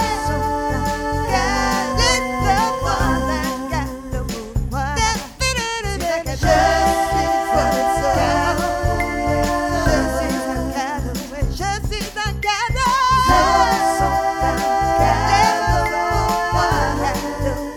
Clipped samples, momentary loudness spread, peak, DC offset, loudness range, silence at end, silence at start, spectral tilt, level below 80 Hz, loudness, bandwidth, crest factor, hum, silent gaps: under 0.1%; 8 LU; -2 dBFS; under 0.1%; 5 LU; 0 s; 0 s; -4.5 dB/octave; -28 dBFS; -19 LUFS; over 20 kHz; 16 dB; none; none